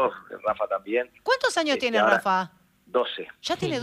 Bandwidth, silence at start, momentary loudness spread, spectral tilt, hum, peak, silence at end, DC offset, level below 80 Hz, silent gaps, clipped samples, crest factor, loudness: 15 kHz; 0 s; 10 LU; -3.5 dB/octave; none; -6 dBFS; 0 s; under 0.1%; -66 dBFS; none; under 0.1%; 20 dB; -25 LUFS